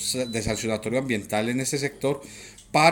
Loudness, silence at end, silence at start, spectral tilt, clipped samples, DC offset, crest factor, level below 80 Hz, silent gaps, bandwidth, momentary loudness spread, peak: -26 LUFS; 0 s; 0 s; -4 dB/octave; under 0.1%; under 0.1%; 22 dB; -50 dBFS; none; 19 kHz; 6 LU; -4 dBFS